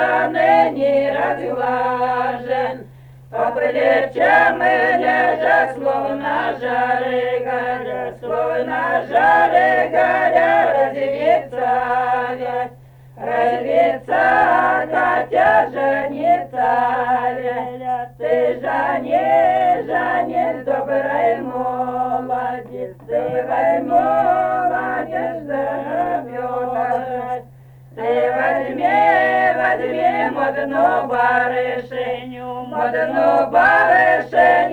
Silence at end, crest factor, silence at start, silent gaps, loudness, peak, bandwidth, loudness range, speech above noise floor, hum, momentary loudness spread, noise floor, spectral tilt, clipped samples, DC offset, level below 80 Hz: 0 s; 16 dB; 0 s; none; -17 LUFS; -2 dBFS; 9.6 kHz; 4 LU; 25 dB; none; 10 LU; -42 dBFS; -6.5 dB/octave; under 0.1%; under 0.1%; -54 dBFS